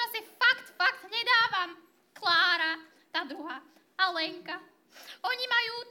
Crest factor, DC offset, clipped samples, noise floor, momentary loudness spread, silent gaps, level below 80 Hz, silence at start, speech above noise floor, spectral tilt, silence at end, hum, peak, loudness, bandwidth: 20 dB; under 0.1%; under 0.1%; -55 dBFS; 17 LU; none; under -90 dBFS; 0 s; 23 dB; -1 dB/octave; 0 s; none; -10 dBFS; -28 LUFS; 17.5 kHz